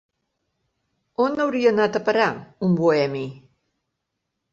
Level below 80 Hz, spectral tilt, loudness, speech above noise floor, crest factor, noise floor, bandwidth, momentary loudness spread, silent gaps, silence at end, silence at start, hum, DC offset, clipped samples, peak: -66 dBFS; -7 dB/octave; -21 LUFS; 59 dB; 18 dB; -79 dBFS; 7.8 kHz; 10 LU; none; 1.15 s; 1.2 s; none; under 0.1%; under 0.1%; -6 dBFS